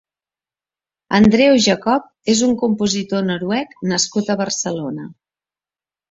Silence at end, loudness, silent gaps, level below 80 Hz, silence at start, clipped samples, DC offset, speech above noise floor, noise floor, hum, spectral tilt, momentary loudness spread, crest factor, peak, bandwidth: 1 s; -17 LUFS; none; -50 dBFS; 1.1 s; under 0.1%; under 0.1%; over 73 dB; under -90 dBFS; none; -4 dB/octave; 10 LU; 16 dB; -2 dBFS; 8 kHz